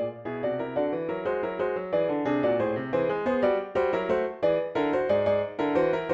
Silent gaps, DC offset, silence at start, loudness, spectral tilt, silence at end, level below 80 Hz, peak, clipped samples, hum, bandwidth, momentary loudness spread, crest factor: none; under 0.1%; 0 s; -27 LUFS; -8 dB/octave; 0 s; -60 dBFS; -12 dBFS; under 0.1%; none; 7.4 kHz; 5 LU; 14 dB